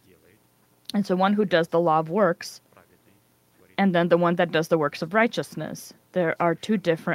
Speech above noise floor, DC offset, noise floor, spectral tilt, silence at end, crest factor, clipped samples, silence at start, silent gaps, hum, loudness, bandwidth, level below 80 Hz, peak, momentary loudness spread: 39 dB; under 0.1%; -62 dBFS; -6 dB/octave; 0 s; 18 dB; under 0.1%; 0.95 s; none; none; -23 LUFS; 16 kHz; -70 dBFS; -6 dBFS; 13 LU